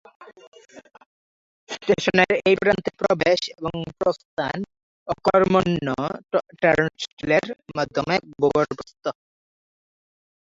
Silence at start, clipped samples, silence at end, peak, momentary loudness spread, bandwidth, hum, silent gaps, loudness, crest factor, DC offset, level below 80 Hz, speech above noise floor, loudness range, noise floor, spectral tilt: 0.2 s; under 0.1%; 1.3 s; 0 dBFS; 13 LU; 7.8 kHz; none; 0.47-0.52 s, 1.06-1.67 s, 4.25-4.37 s, 4.83-5.06 s, 7.13-7.17 s; -22 LUFS; 24 dB; under 0.1%; -54 dBFS; over 68 dB; 2 LU; under -90 dBFS; -5.5 dB/octave